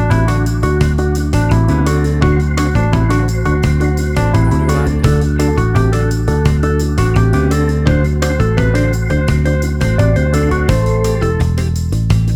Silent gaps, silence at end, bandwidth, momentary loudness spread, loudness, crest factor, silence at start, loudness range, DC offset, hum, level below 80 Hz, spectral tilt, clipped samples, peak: none; 0 s; 14 kHz; 2 LU; -14 LUFS; 12 dB; 0 s; 0 LU; under 0.1%; none; -18 dBFS; -7 dB/octave; under 0.1%; 0 dBFS